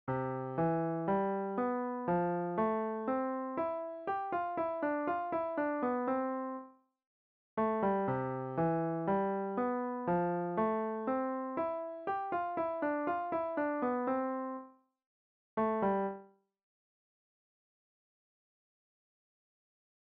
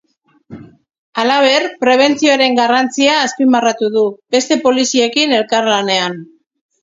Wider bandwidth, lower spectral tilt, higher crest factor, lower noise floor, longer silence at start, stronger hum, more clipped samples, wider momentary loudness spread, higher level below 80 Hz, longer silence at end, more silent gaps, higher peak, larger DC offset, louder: second, 4.7 kHz vs 7.8 kHz; first, -7.5 dB/octave vs -2.5 dB/octave; about the same, 14 dB vs 14 dB; first, -55 dBFS vs -48 dBFS; second, 0.05 s vs 0.5 s; neither; neither; about the same, 5 LU vs 5 LU; second, -72 dBFS vs -62 dBFS; first, 3.75 s vs 0.6 s; first, 7.06-7.57 s, 15.06-15.57 s vs 0.98-1.13 s; second, -22 dBFS vs 0 dBFS; neither; second, -35 LUFS vs -13 LUFS